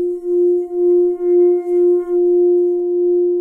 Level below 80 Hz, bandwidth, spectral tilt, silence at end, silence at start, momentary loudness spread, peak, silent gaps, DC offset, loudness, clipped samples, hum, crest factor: -60 dBFS; 2.2 kHz; -9 dB/octave; 0 s; 0 s; 3 LU; -6 dBFS; none; under 0.1%; -15 LUFS; under 0.1%; none; 8 dB